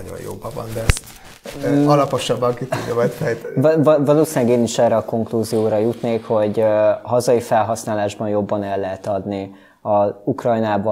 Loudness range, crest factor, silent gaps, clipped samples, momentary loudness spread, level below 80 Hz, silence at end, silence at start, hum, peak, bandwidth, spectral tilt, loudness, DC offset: 4 LU; 16 dB; none; under 0.1%; 12 LU; -38 dBFS; 0 s; 0 s; none; -2 dBFS; 16 kHz; -6 dB/octave; -18 LUFS; under 0.1%